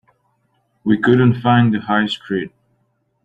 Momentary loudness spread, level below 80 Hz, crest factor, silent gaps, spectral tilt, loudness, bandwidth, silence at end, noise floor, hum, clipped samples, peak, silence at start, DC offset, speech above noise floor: 11 LU; -56 dBFS; 16 dB; none; -8 dB/octave; -16 LUFS; 8 kHz; 0.75 s; -65 dBFS; none; under 0.1%; -2 dBFS; 0.85 s; under 0.1%; 50 dB